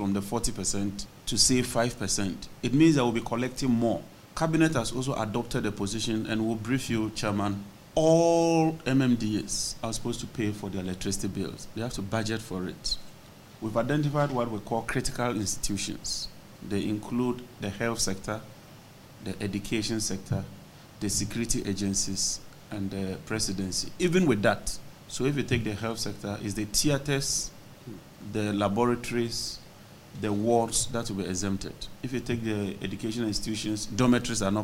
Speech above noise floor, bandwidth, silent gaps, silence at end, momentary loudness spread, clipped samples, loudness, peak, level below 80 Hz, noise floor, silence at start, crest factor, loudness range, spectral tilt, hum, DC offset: 22 dB; 16 kHz; none; 0 s; 12 LU; under 0.1%; -29 LUFS; -8 dBFS; -46 dBFS; -50 dBFS; 0 s; 20 dB; 6 LU; -4.5 dB/octave; none; under 0.1%